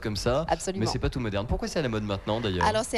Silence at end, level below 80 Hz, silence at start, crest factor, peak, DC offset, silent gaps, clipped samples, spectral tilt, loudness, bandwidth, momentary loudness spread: 0 s; -40 dBFS; 0 s; 16 dB; -12 dBFS; under 0.1%; none; under 0.1%; -5 dB/octave; -28 LUFS; 13.5 kHz; 4 LU